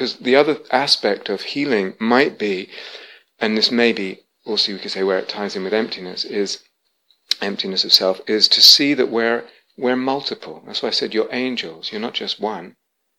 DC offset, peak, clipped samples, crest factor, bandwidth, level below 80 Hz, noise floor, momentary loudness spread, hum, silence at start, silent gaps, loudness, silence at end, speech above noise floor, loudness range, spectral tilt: under 0.1%; 0 dBFS; under 0.1%; 20 dB; 16.5 kHz; -74 dBFS; -63 dBFS; 13 LU; none; 0 s; none; -17 LUFS; 0.5 s; 44 dB; 8 LU; -2.5 dB/octave